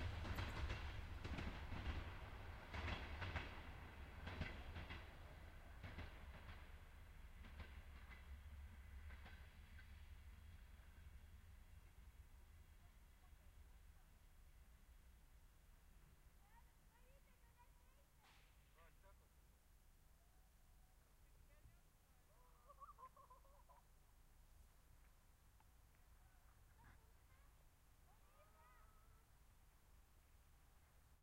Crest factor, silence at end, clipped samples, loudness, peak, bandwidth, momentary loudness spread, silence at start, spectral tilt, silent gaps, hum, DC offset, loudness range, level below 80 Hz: 24 dB; 0 s; under 0.1%; -56 LUFS; -34 dBFS; 16 kHz; 18 LU; 0 s; -5.5 dB/octave; none; none; under 0.1%; 16 LU; -62 dBFS